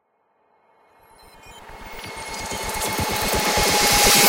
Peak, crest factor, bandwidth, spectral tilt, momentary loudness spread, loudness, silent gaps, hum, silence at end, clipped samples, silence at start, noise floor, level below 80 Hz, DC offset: -4 dBFS; 20 dB; 17 kHz; -1.5 dB/octave; 22 LU; -19 LUFS; none; none; 0 s; under 0.1%; 1.45 s; -66 dBFS; -38 dBFS; under 0.1%